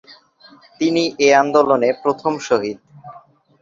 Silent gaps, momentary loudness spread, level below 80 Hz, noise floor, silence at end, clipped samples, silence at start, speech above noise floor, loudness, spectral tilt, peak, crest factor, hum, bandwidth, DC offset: none; 9 LU; -62 dBFS; -48 dBFS; 0.45 s; under 0.1%; 0.1 s; 32 dB; -17 LUFS; -4 dB/octave; -2 dBFS; 16 dB; none; 7.8 kHz; under 0.1%